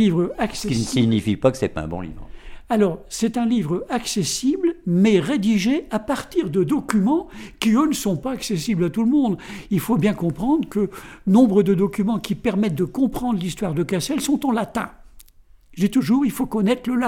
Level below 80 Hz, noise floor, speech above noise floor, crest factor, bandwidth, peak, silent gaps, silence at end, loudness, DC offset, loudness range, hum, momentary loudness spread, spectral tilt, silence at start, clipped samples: -44 dBFS; -49 dBFS; 29 dB; 16 dB; 16.5 kHz; -4 dBFS; none; 0 s; -21 LUFS; under 0.1%; 3 LU; none; 7 LU; -6 dB/octave; 0 s; under 0.1%